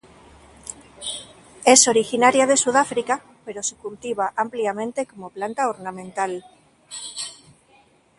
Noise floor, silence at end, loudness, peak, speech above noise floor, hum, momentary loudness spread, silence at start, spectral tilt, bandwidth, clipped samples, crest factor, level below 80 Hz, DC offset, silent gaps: -57 dBFS; 0.85 s; -21 LUFS; 0 dBFS; 36 dB; none; 20 LU; 0.65 s; -1.5 dB/octave; 11.5 kHz; under 0.1%; 24 dB; -62 dBFS; under 0.1%; none